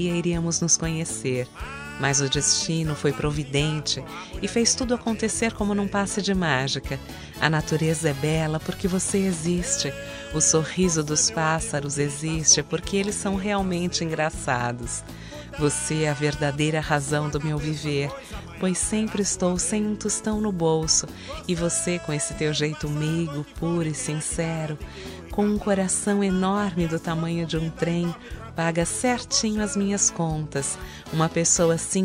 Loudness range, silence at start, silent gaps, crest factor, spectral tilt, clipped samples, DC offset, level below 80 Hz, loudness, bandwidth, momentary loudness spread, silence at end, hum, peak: 3 LU; 0 s; none; 22 dB; -4 dB/octave; under 0.1%; under 0.1%; -42 dBFS; -24 LUFS; 16 kHz; 10 LU; 0 s; none; -4 dBFS